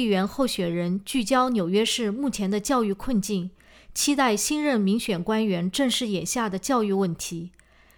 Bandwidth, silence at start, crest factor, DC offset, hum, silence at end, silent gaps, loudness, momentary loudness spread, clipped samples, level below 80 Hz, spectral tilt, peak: over 20 kHz; 0 s; 16 dB; under 0.1%; none; 0.5 s; none; -24 LUFS; 7 LU; under 0.1%; -52 dBFS; -4 dB/octave; -10 dBFS